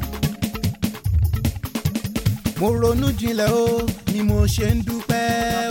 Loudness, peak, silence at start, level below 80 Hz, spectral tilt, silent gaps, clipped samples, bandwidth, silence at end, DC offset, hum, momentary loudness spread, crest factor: -21 LUFS; -4 dBFS; 0 s; -30 dBFS; -6 dB/octave; none; under 0.1%; 17 kHz; 0 s; under 0.1%; none; 6 LU; 16 dB